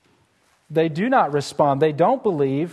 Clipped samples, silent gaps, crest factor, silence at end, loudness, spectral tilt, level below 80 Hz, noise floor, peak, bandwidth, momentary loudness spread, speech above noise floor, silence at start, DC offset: under 0.1%; none; 16 dB; 0 s; -20 LUFS; -6.5 dB/octave; -64 dBFS; -62 dBFS; -4 dBFS; 12.5 kHz; 4 LU; 42 dB; 0.7 s; under 0.1%